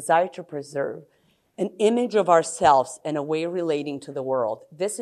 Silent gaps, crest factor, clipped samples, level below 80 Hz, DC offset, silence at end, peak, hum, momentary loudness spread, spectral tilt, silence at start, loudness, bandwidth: none; 20 dB; under 0.1%; -64 dBFS; under 0.1%; 0 s; -4 dBFS; none; 13 LU; -4.5 dB/octave; 0 s; -24 LUFS; 13 kHz